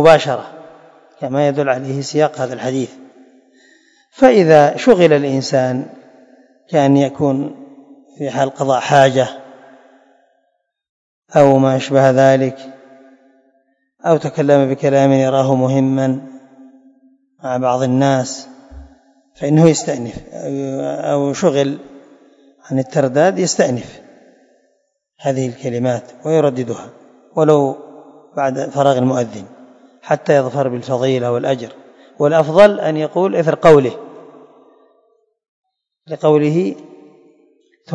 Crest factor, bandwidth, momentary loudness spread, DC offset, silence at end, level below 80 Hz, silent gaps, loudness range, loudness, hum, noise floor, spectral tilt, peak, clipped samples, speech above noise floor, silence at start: 16 dB; 8.6 kHz; 15 LU; under 0.1%; 0 s; -54 dBFS; 10.89-11.22 s, 35.48-35.64 s; 6 LU; -15 LUFS; none; -67 dBFS; -6 dB/octave; 0 dBFS; 0.2%; 53 dB; 0 s